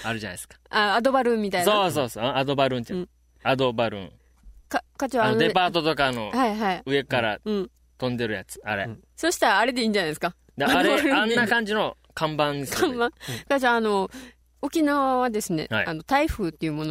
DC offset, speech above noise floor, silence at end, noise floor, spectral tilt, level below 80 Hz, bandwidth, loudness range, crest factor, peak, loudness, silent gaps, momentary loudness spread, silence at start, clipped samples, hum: under 0.1%; 27 dB; 0 s; -51 dBFS; -4.5 dB/octave; -50 dBFS; 16 kHz; 3 LU; 18 dB; -6 dBFS; -24 LUFS; none; 11 LU; 0 s; under 0.1%; none